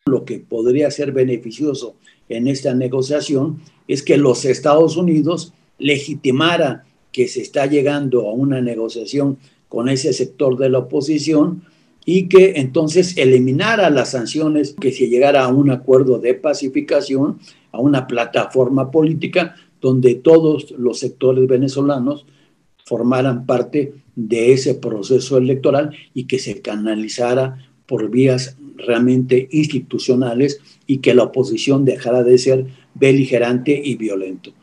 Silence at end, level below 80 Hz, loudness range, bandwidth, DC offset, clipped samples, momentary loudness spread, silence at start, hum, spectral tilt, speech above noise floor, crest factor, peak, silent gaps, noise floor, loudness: 0.15 s; -64 dBFS; 4 LU; 10.5 kHz; under 0.1%; under 0.1%; 11 LU; 0.05 s; none; -6 dB/octave; 41 dB; 16 dB; 0 dBFS; none; -56 dBFS; -16 LUFS